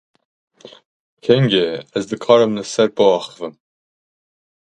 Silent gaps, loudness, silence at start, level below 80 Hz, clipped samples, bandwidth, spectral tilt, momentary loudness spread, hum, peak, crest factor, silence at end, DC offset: 0.86-1.17 s; -16 LUFS; 0.65 s; -60 dBFS; under 0.1%; 9.2 kHz; -5.5 dB/octave; 14 LU; none; 0 dBFS; 20 dB; 1.15 s; under 0.1%